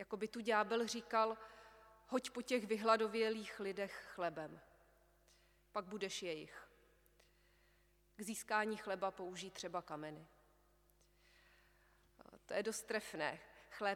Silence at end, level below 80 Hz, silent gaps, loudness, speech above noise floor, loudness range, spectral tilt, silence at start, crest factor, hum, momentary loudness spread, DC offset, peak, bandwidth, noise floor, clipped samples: 0 s; -76 dBFS; none; -42 LUFS; 32 dB; 11 LU; -3.5 dB/octave; 0 s; 24 dB; 50 Hz at -75 dBFS; 16 LU; under 0.1%; -20 dBFS; 18.5 kHz; -74 dBFS; under 0.1%